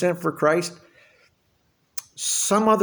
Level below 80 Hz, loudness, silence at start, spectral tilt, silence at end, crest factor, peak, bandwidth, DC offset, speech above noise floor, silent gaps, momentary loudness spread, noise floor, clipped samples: -70 dBFS; -22 LUFS; 0 s; -3.5 dB/octave; 0 s; 18 dB; -6 dBFS; over 20 kHz; under 0.1%; 45 dB; none; 16 LU; -66 dBFS; under 0.1%